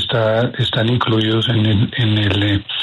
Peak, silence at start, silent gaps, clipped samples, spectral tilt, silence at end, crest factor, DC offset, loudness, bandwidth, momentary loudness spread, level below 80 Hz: -4 dBFS; 0 s; none; under 0.1%; -7 dB/octave; 0 s; 12 dB; under 0.1%; -16 LUFS; 7.8 kHz; 2 LU; -44 dBFS